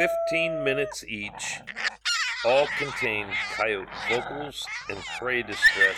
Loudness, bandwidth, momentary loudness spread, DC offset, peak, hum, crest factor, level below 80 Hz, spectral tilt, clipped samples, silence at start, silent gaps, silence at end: -26 LUFS; 19 kHz; 11 LU; under 0.1%; -8 dBFS; none; 18 dB; -56 dBFS; -2.5 dB/octave; under 0.1%; 0 s; none; 0 s